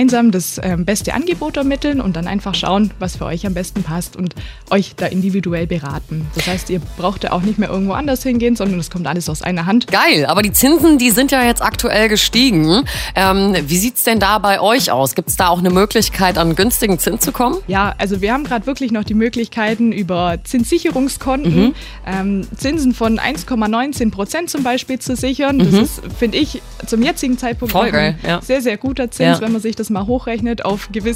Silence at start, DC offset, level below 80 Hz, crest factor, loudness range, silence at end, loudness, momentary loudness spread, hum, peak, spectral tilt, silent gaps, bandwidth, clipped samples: 0 s; under 0.1%; -32 dBFS; 16 dB; 7 LU; 0 s; -15 LUFS; 9 LU; none; 0 dBFS; -4.5 dB/octave; none; 16.5 kHz; under 0.1%